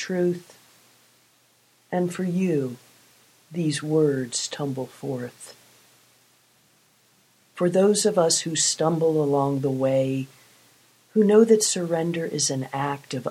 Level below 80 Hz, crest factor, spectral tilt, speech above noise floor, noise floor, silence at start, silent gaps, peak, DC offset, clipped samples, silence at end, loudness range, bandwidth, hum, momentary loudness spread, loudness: -72 dBFS; 20 dB; -4.5 dB/octave; 39 dB; -61 dBFS; 0 s; none; -6 dBFS; under 0.1%; under 0.1%; 0 s; 8 LU; 15.5 kHz; none; 13 LU; -23 LUFS